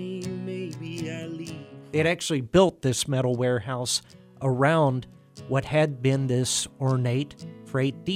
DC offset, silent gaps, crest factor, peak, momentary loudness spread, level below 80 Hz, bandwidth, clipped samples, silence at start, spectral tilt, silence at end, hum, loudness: under 0.1%; none; 20 dB; -6 dBFS; 13 LU; -54 dBFS; 15 kHz; under 0.1%; 0 s; -5 dB/octave; 0 s; none; -26 LUFS